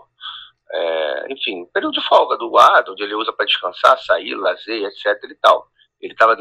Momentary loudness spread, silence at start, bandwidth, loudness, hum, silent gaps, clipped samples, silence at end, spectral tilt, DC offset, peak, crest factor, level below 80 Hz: 17 LU; 0.2 s; 14.5 kHz; -17 LUFS; none; none; under 0.1%; 0 s; -2 dB/octave; under 0.1%; 0 dBFS; 16 dB; -66 dBFS